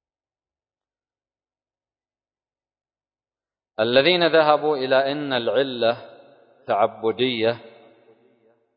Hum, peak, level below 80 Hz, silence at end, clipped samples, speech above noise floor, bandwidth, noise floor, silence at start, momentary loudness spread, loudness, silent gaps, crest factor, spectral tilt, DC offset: none; -2 dBFS; -72 dBFS; 1.1 s; under 0.1%; over 70 dB; 5.2 kHz; under -90 dBFS; 3.8 s; 9 LU; -20 LUFS; none; 22 dB; -9 dB/octave; under 0.1%